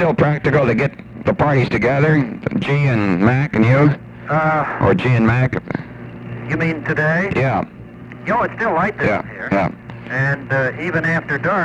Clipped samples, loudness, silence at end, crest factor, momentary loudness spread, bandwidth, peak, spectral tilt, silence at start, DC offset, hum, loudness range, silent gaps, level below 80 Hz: under 0.1%; -17 LUFS; 0 s; 16 dB; 12 LU; 7.8 kHz; 0 dBFS; -8.5 dB/octave; 0 s; under 0.1%; none; 4 LU; none; -42 dBFS